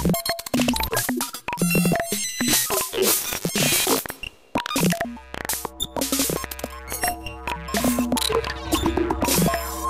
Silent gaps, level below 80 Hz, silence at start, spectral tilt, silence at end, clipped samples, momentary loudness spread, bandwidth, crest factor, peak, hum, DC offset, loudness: none; -40 dBFS; 0 s; -3 dB/octave; 0 s; under 0.1%; 11 LU; 16 kHz; 16 dB; -8 dBFS; none; under 0.1%; -23 LUFS